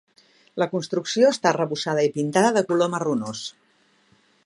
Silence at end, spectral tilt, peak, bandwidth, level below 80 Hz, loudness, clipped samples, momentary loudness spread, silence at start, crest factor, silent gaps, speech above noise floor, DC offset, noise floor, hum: 0.95 s; -4.5 dB/octave; -2 dBFS; 11.5 kHz; -74 dBFS; -22 LUFS; under 0.1%; 12 LU; 0.55 s; 20 dB; none; 40 dB; under 0.1%; -62 dBFS; none